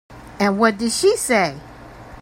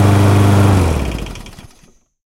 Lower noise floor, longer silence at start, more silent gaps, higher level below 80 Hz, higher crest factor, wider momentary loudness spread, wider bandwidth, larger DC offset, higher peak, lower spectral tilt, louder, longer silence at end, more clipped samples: second, -39 dBFS vs -49 dBFS; about the same, 0.1 s vs 0 s; neither; second, -48 dBFS vs -26 dBFS; about the same, 18 dB vs 14 dB; second, 7 LU vs 18 LU; about the same, 16.5 kHz vs 15.5 kHz; neither; about the same, -2 dBFS vs 0 dBFS; second, -3.5 dB/octave vs -7 dB/octave; second, -18 LUFS vs -12 LUFS; second, 0 s vs 0.75 s; neither